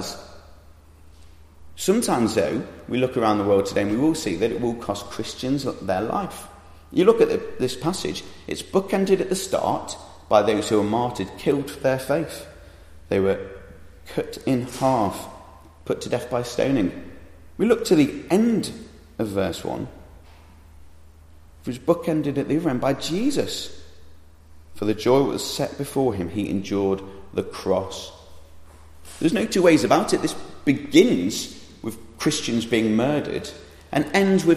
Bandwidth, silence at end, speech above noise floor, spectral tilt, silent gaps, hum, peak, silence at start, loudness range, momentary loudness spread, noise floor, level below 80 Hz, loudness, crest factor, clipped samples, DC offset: 15 kHz; 0 s; 27 dB; -5.5 dB/octave; none; none; -2 dBFS; 0 s; 5 LU; 16 LU; -49 dBFS; -50 dBFS; -23 LUFS; 22 dB; under 0.1%; under 0.1%